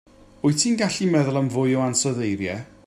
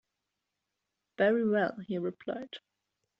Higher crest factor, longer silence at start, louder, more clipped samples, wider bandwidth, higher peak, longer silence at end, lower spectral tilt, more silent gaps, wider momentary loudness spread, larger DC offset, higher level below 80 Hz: about the same, 16 dB vs 20 dB; second, 0.45 s vs 1.2 s; first, -22 LUFS vs -31 LUFS; neither; first, 13.5 kHz vs 6 kHz; first, -6 dBFS vs -14 dBFS; second, 0.2 s vs 0.6 s; about the same, -4.5 dB/octave vs -4.5 dB/octave; neither; second, 5 LU vs 16 LU; neither; first, -60 dBFS vs -78 dBFS